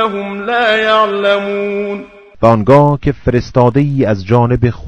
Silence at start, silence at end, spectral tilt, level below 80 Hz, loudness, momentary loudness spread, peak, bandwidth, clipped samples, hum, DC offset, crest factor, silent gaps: 0 s; 0 s; -7.5 dB/octave; -34 dBFS; -12 LUFS; 9 LU; 0 dBFS; 8.6 kHz; 0.8%; none; under 0.1%; 12 dB; none